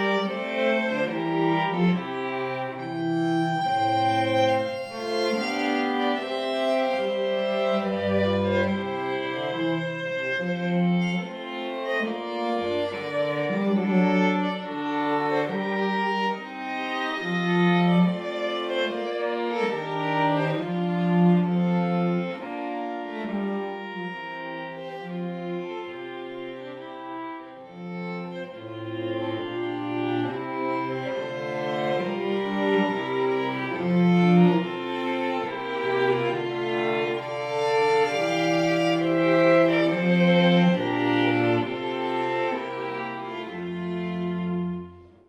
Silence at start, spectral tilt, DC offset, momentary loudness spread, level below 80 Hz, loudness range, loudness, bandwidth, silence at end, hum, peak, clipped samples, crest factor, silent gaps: 0 s; -7 dB/octave; under 0.1%; 12 LU; -70 dBFS; 10 LU; -25 LUFS; 9 kHz; 0.25 s; none; -8 dBFS; under 0.1%; 16 dB; none